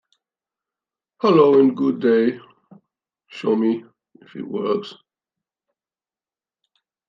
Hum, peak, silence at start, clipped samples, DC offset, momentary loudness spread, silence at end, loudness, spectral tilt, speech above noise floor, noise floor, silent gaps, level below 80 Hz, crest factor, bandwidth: none; -2 dBFS; 1.25 s; under 0.1%; under 0.1%; 23 LU; 2.15 s; -19 LUFS; -8 dB/octave; over 72 dB; under -90 dBFS; none; -76 dBFS; 20 dB; 6.4 kHz